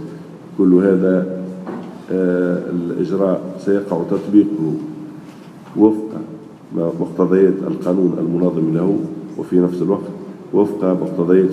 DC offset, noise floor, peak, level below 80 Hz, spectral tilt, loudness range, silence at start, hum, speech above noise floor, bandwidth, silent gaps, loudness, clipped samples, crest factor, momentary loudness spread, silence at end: under 0.1%; -37 dBFS; 0 dBFS; -66 dBFS; -9.5 dB/octave; 2 LU; 0 s; none; 21 dB; 10.5 kHz; none; -17 LUFS; under 0.1%; 16 dB; 16 LU; 0 s